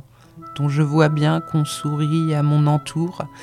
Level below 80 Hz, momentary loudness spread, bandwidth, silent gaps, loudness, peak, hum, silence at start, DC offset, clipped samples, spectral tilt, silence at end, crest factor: -58 dBFS; 8 LU; 12.5 kHz; none; -20 LUFS; -2 dBFS; none; 0.35 s; under 0.1%; under 0.1%; -7 dB/octave; 0 s; 18 dB